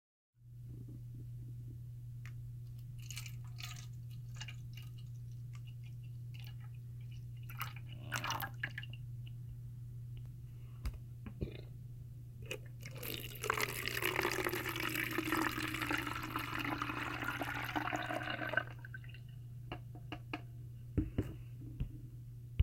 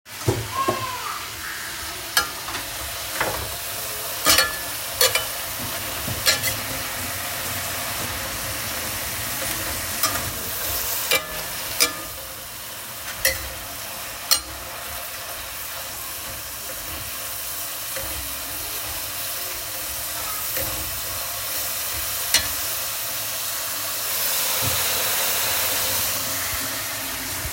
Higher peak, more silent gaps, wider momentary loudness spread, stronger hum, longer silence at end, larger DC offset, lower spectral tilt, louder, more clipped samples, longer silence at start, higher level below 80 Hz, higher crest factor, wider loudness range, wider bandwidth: second, -16 dBFS vs 0 dBFS; neither; first, 14 LU vs 10 LU; neither; about the same, 0 s vs 0 s; neither; first, -4.5 dB/octave vs -1 dB/octave; second, -42 LUFS vs -23 LUFS; neither; first, 0.4 s vs 0.05 s; second, -56 dBFS vs -46 dBFS; about the same, 26 dB vs 26 dB; first, 11 LU vs 6 LU; about the same, 17 kHz vs 17 kHz